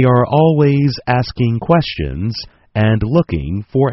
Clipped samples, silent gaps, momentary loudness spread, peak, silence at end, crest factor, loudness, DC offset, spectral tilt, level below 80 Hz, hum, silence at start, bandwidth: under 0.1%; none; 10 LU; 0 dBFS; 0 s; 14 dB; -15 LUFS; under 0.1%; -6.5 dB/octave; -34 dBFS; none; 0 s; 6 kHz